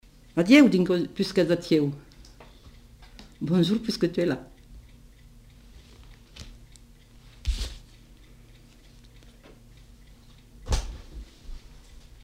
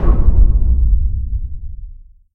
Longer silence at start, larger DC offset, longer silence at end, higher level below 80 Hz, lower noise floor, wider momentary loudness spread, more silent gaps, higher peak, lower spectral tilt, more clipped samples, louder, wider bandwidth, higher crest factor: first, 0.35 s vs 0 s; neither; first, 0.45 s vs 0 s; second, -42 dBFS vs -14 dBFS; first, -52 dBFS vs -35 dBFS; first, 29 LU vs 18 LU; neither; second, -4 dBFS vs 0 dBFS; second, -6 dB/octave vs -12.5 dB/octave; neither; second, -24 LUFS vs -17 LUFS; first, 16 kHz vs 2 kHz; first, 24 dB vs 12 dB